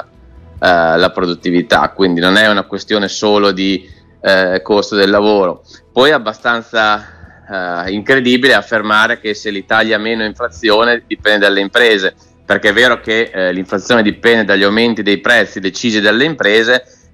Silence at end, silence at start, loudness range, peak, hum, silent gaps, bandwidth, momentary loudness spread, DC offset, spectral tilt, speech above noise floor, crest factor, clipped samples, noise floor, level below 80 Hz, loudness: 0.3 s; 0.55 s; 2 LU; 0 dBFS; none; none; 15.5 kHz; 8 LU; under 0.1%; -4 dB/octave; 27 dB; 12 dB; under 0.1%; -39 dBFS; -46 dBFS; -12 LUFS